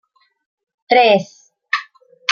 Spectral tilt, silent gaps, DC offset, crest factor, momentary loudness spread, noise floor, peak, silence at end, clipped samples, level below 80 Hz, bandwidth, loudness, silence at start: -3.5 dB/octave; none; under 0.1%; 18 dB; 12 LU; -40 dBFS; -2 dBFS; 0 s; under 0.1%; -68 dBFS; 7.2 kHz; -16 LUFS; 0.9 s